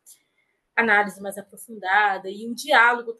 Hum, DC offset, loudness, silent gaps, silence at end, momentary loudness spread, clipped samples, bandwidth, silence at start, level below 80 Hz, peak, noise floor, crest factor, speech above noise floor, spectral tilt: none; under 0.1%; -20 LUFS; none; 0.05 s; 18 LU; under 0.1%; 12.5 kHz; 0.75 s; -80 dBFS; -2 dBFS; -71 dBFS; 20 dB; 49 dB; -2.5 dB/octave